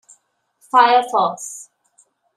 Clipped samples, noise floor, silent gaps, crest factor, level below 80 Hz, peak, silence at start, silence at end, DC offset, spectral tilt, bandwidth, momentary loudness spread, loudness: under 0.1%; -62 dBFS; none; 18 dB; -80 dBFS; -2 dBFS; 0.75 s; 0.75 s; under 0.1%; -2 dB/octave; 13 kHz; 19 LU; -16 LUFS